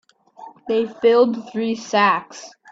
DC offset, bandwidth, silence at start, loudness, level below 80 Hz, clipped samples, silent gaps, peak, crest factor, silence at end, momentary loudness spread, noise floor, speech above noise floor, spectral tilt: under 0.1%; 7.8 kHz; 0.4 s; -19 LUFS; -70 dBFS; under 0.1%; none; -2 dBFS; 18 dB; 0.2 s; 22 LU; -43 dBFS; 24 dB; -4.5 dB/octave